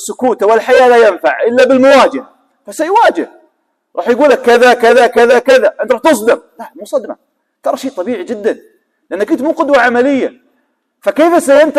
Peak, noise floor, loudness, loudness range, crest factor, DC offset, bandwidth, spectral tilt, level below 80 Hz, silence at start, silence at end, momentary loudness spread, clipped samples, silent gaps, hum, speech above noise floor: 0 dBFS; -61 dBFS; -10 LUFS; 7 LU; 10 dB; under 0.1%; 14.5 kHz; -3.5 dB/octave; -56 dBFS; 0 s; 0 s; 14 LU; 0.3%; none; none; 52 dB